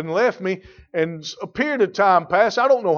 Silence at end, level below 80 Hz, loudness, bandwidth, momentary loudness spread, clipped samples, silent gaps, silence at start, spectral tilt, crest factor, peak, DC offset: 0 s; -58 dBFS; -20 LUFS; 7.2 kHz; 13 LU; under 0.1%; none; 0 s; -5 dB/octave; 16 dB; -4 dBFS; under 0.1%